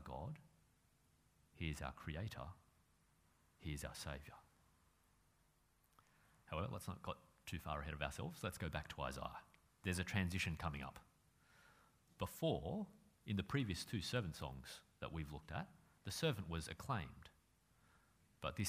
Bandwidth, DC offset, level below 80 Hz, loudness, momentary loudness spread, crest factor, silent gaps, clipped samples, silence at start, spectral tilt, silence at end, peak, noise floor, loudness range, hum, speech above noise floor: 15.5 kHz; under 0.1%; -60 dBFS; -47 LUFS; 14 LU; 24 dB; none; under 0.1%; 0 s; -5 dB/octave; 0 s; -24 dBFS; -77 dBFS; 8 LU; none; 32 dB